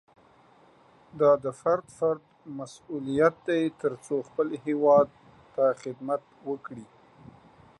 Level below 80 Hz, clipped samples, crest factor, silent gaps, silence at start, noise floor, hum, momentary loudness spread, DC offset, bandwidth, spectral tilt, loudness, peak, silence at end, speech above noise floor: -68 dBFS; under 0.1%; 20 dB; none; 1.15 s; -58 dBFS; none; 17 LU; under 0.1%; 11.5 kHz; -6.5 dB/octave; -27 LUFS; -8 dBFS; 0.95 s; 32 dB